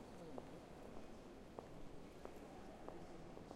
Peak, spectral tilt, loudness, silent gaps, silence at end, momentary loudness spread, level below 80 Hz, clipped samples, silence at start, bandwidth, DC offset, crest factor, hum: -32 dBFS; -6 dB/octave; -57 LUFS; none; 0 s; 3 LU; -64 dBFS; under 0.1%; 0 s; 15.5 kHz; under 0.1%; 22 dB; none